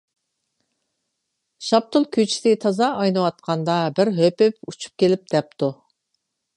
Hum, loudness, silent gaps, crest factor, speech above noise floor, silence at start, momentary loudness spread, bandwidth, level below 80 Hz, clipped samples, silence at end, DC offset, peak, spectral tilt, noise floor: none; -20 LUFS; none; 18 dB; 57 dB; 1.6 s; 8 LU; 11 kHz; -70 dBFS; under 0.1%; 0.85 s; under 0.1%; -2 dBFS; -5.5 dB/octave; -77 dBFS